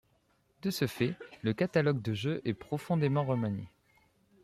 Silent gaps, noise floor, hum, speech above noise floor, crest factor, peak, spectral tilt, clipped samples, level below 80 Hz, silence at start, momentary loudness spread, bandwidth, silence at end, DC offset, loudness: none; -71 dBFS; none; 40 dB; 18 dB; -14 dBFS; -7 dB/octave; under 0.1%; -68 dBFS; 0.65 s; 8 LU; 15 kHz; 0.75 s; under 0.1%; -33 LUFS